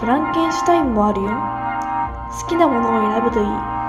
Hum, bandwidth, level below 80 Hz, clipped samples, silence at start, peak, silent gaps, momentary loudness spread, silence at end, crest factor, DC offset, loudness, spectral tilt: none; 14 kHz; -38 dBFS; under 0.1%; 0 s; -2 dBFS; none; 7 LU; 0 s; 16 dB; under 0.1%; -19 LUFS; -6 dB/octave